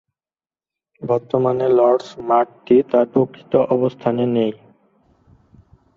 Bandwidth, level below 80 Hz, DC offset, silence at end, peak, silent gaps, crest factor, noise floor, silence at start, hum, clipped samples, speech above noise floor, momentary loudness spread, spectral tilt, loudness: 7.2 kHz; -60 dBFS; under 0.1%; 1.4 s; -2 dBFS; none; 16 dB; under -90 dBFS; 1 s; none; under 0.1%; over 73 dB; 7 LU; -8.5 dB/octave; -18 LUFS